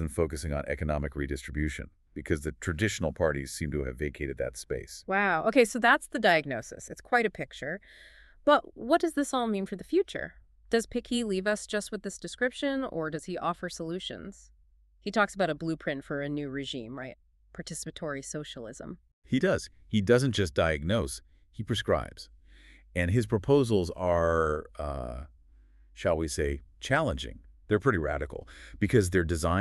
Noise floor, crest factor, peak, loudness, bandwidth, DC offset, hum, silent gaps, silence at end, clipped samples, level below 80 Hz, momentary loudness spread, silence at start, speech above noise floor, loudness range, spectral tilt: -62 dBFS; 22 dB; -8 dBFS; -30 LUFS; 13.5 kHz; under 0.1%; none; 19.13-19.22 s; 0 s; under 0.1%; -46 dBFS; 16 LU; 0 s; 32 dB; 6 LU; -5.5 dB/octave